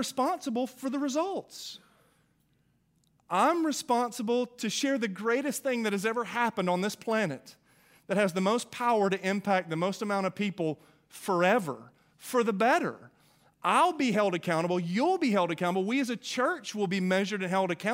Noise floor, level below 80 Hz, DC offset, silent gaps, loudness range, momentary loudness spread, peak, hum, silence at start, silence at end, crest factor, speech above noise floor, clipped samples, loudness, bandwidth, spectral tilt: -70 dBFS; -78 dBFS; under 0.1%; none; 4 LU; 8 LU; -10 dBFS; none; 0 s; 0 s; 18 dB; 41 dB; under 0.1%; -29 LUFS; 16 kHz; -5 dB/octave